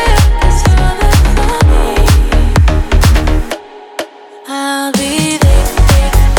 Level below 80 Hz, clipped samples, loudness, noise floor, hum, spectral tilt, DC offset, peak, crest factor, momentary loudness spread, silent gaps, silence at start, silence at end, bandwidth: -10 dBFS; under 0.1%; -11 LUFS; -29 dBFS; none; -5 dB/octave; under 0.1%; 0 dBFS; 8 dB; 13 LU; none; 0 s; 0 s; 19 kHz